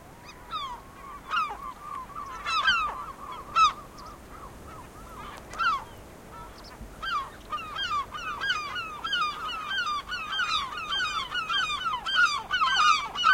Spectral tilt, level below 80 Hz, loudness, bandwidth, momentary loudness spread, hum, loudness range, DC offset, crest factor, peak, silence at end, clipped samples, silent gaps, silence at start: -1 dB/octave; -52 dBFS; -27 LUFS; 16.5 kHz; 22 LU; none; 7 LU; under 0.1%; 22 dB; -8 dBFS; 0 s; under 0.1%; none; 0 s